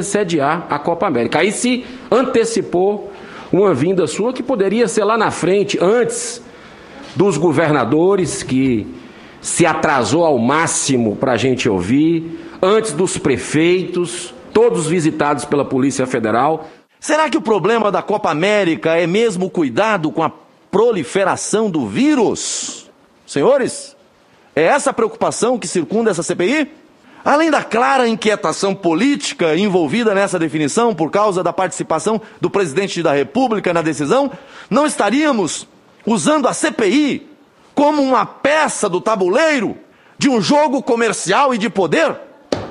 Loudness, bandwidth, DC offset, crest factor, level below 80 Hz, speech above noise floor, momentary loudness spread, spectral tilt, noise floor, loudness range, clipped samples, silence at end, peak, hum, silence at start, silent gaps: -16 LUFS; 11.5 kHz; under 0.1%; 16 dB; -54 dBFS; 35 dB; 8 LU; -4.5 dB/octave; -50 dBFS; 2 LU; under 0.1%; 0 s; 0 dBFS; none; 0 s; none